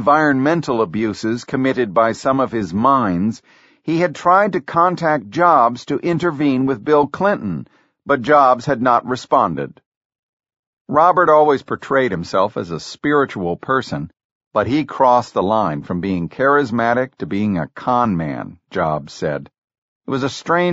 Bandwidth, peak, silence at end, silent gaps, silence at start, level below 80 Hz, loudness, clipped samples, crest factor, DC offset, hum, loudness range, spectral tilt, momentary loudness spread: 8 kHz; 0 dBFS; 0 s; 9.86-10.10 s, 10.19-10.37 s, 10.59-10.85 s, 14.25-14.51 s, 19.58-19.68 s, 19.78-20.01 s; 0 s; -52 dBFS; -17 LUFS; under 0.1%; 16 dB; under 0.1%; none; 3 LU; -5 dB/octave; 10 LU